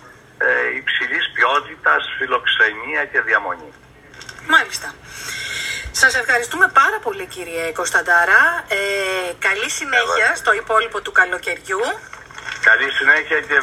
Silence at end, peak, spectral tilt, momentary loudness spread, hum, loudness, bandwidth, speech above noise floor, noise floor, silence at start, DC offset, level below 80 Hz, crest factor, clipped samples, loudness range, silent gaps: 0 s; 0 dBFS; -1 dB/octave; 14 LU; none; -16 LUFS; 16 kHz; 22 dB; -39 dBFS; 0.05 s; under 0.1%; -50 dBFS; 18 dB; under 0.1%; 3 LU; none